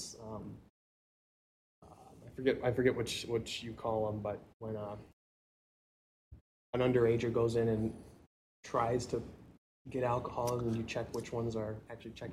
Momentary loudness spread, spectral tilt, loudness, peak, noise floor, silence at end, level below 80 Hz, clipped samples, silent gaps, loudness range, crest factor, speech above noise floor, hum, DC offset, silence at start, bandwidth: 16 LU; -6 dB/octave; -36 LUFS; -16 dBFS; -55 dBFS; 0 s; -60 dBFS; under 0.1%; 0.70-1.82 s, 4.54-4.60 s, 5.13-6.31 s, 6.41-6.73 s, 8.26-8.63 s, 9.58-9.85 s; 6 LU; 20 dB; 20 dB; none; under 0.1%; 0 s; 15 kHz